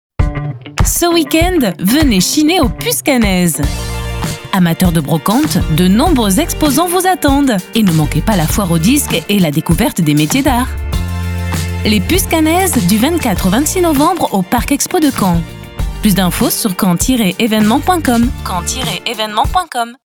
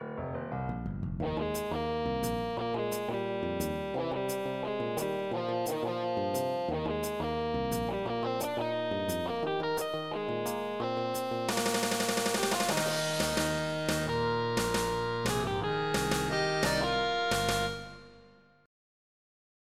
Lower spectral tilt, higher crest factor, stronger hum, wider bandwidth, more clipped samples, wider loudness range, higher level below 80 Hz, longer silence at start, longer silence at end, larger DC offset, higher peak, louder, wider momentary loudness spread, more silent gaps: about the same, -4.5 dB/octave vs -4 dB/octave; about the same, 12 dB vs 16 dB; neither; first, over 20 kHz vs 16 kHz; neither; about the same, 2 LU vs 4 LU; first, -24 dBFS vs -50 dBFS; first, 0.2 s vs 0 s; second, 0.1 s vs 1.35 s; neither; first, 0 dBFS vs -16 dBFS; first, -13 LUFS vs -32 LUFS; about the same, 7 LU vs 5 LU; neither